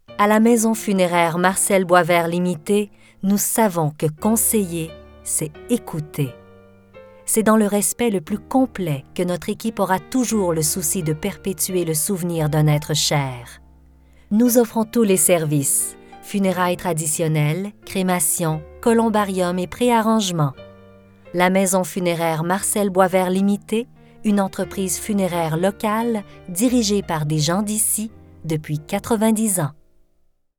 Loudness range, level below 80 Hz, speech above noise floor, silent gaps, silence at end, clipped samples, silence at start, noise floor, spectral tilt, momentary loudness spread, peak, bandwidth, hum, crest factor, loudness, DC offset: 3 LU; -48 dBFS; 41 dB; none; 0.85 s; under 0.1%; 0.1 s; -60 dBFS; -4.5 dB/octave; 10 LU; 0 dBFS; over 20 kHz; none; 20 dB; -19 LUFS; under 0.1%